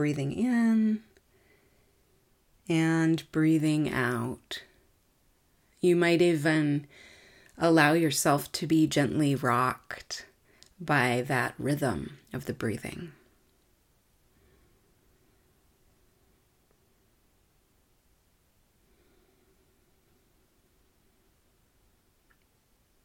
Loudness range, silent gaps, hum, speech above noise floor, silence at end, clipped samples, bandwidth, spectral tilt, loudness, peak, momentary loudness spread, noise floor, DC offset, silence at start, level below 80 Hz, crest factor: 10 LU; none; none; 42 dB; 9.95 s; under 0.1%; 17 kHz; -5.5 dB/octave; -27 LUFS; -6 dBFS; 16 LU; -68 dBFS; under 0.1%; 0 s; -64 dBFS; 24 dB